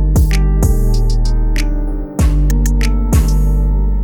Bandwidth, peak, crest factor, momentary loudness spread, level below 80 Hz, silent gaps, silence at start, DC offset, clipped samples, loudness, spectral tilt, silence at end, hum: 16.5 kHz; 0 dBFS; 12 dB; 5 LU; -12 dBFS; none; 0 s; under 0.1%; under 0.1%; -15 LUFS; -6.5 dB/octave; 0 s; none